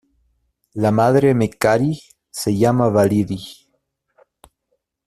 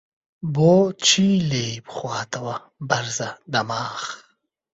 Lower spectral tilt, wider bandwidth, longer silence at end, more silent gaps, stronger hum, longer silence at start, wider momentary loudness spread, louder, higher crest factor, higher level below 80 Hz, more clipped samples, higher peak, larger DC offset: first, -6.5 dB/octave vs -4 dB/octave; first, 14.5 kHz vs 8 kHz; first, 1.55 s vs 0.6 s; neither; neither; first, 0.75 s vs 0.4 s; about the same, 16 LU vs 15 LU; first, -17 LUFS vs -21 LUFS; about the same, 16 dB vs 18 dB; first, -52 dBFS vs -58 dBFS; neither; about the same, -2 dBFS vs -4 dBFS; neither